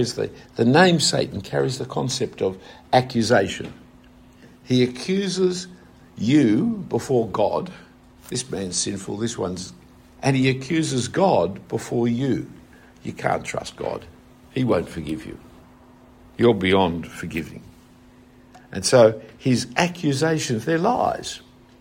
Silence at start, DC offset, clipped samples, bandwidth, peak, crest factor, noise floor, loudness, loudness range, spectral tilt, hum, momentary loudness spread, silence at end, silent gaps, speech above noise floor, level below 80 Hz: 0 s; under 0.1%; under 0.1%; 16 kHz; -2 dBFS; 22 dB; -50 dBFS; -22 LUFS; 6 LU; -5 dB/octave; none; 15 LU; 0.45 s; none; 28 dB; -54 dBFS